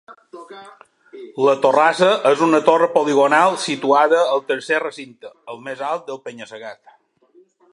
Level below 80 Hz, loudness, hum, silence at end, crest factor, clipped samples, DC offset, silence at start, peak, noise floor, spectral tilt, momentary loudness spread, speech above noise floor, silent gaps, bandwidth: -72 dBFS; -16 LUFS; none; 1 s; 18 dB; under 0.1%; under 0.1%; 0.1 s; -2 dBFS; -54 dBFS; -4 dB/octave; 21 LU; 37 dB; none; 11.5 kHz